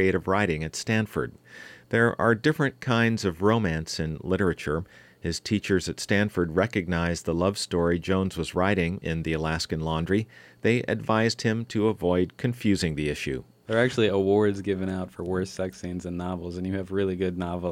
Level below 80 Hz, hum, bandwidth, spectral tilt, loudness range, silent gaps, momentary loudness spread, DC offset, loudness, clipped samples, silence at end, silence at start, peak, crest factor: -48 dBFS; none; 16 kHz; -6 dB/octave; 2 LU; none; 9 LU; under 0.1%; -26 LUFS; under 0.1%; 0 s; 0 s; -8 dBFS; 16 dB